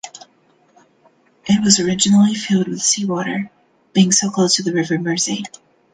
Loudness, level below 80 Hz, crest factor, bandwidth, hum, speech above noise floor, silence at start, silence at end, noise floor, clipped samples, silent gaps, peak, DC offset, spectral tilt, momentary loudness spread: -16 LUFS; -58 dBFS; 18 dB; 10 kHz; none; 40 dB; 0.05 s; 0.45 s; -56 dBFS; under 0.1%; none; 0 dBFS; under 0.1%; -3.5 dB/octave; 13 LU